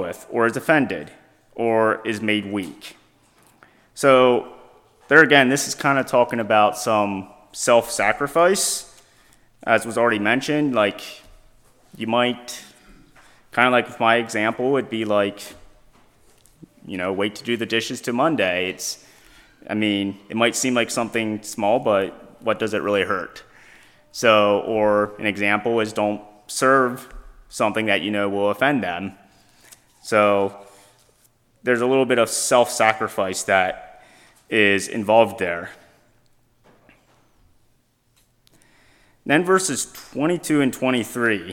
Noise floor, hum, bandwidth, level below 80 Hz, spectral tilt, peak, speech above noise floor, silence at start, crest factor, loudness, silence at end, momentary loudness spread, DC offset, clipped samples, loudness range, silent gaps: -62 dBFS; none; 17.5 kHz; -58 dBFS; -3.5 dB/octave; 0 dBFS; 42 dB; 0 s; 22 dB; -20 LUFS; 0 s; 13 LU; under 0.1%; under 0.1%; 7 LU; none